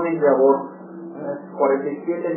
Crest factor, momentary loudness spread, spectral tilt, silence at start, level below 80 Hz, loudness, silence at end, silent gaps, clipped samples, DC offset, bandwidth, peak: 16 dB; 19 LU; -13.5 dB/octave; 0 s; -82 dBFS; -20 LUFS; 0 s; none; under 0.1%; under 0.1%; 2.9 kHz; -4 dBFS